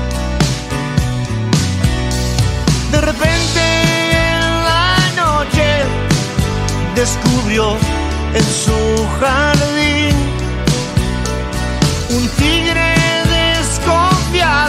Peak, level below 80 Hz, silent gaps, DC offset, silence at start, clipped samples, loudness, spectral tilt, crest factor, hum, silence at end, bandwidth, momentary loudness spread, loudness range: 0 dBFS; -22 dBFS; none; under 0.1%; 0 s; under 0.1%; -14 LUFS; -4.5 dB/octave; 14 dB; none; 0 s; 16 kHz; 5 LU; 2 LU